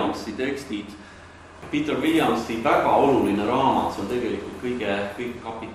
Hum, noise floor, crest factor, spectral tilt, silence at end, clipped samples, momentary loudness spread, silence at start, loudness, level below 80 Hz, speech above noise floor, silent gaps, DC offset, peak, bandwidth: none; -44 dBFS; 18 dB; -5.5 dB/octave; 0 s; under 0.1%; 14 LU; 0 s; -24 LUFS; -52 dBFS; 21 dB; none; under 0.1%; -6 dBFS; 15 kHz